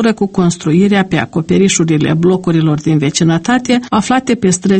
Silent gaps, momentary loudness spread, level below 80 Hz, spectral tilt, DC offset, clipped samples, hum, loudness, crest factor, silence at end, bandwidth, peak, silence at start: none; 3 LU; -44 dBFS; -5.5 dB/octave; under 0.1%; under 0.1%; none; -12 LUFS; 12 dB; 0 s; 8.8 kHz; 0 dBFS; 0 s